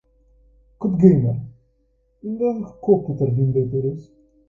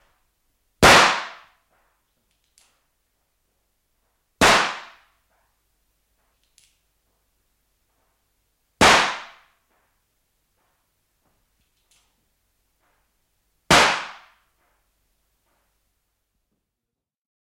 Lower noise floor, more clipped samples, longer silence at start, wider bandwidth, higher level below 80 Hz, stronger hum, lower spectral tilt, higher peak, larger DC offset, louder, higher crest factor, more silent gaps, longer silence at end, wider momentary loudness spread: second, -64 dBFS vs -85 dBFS; neither; about the same, 0.8 s vs 0.8 s; second, 2.6 kHz vs 16.5 kHz; about the same, -50 dBFS vs -48 dBFS; neither; first, -13 dB/octave vs -2 dB/octave; about the same, 0 dBFS vs 0 dBFS; neither; second, -20 LUFS vs -16 LUFS; about the same, 20 dB vs 24 dB; neither; second, 0.45 s vs 3.35 s; second, 17 LU vs 23 LU